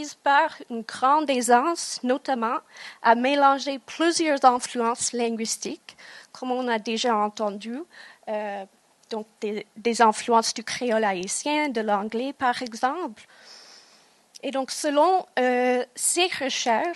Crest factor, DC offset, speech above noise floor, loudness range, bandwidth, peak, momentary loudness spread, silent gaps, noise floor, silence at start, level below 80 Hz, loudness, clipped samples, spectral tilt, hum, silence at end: 22 dB; under 0.1%; 33 dB; 6 LU; 12.5 kHz; -2 dBFS; 15 LU; none; -57 dBFS; 0 s; -78 dBFS; -24 LUFS; under 0.1%; -2 dB/octave; none; 0 s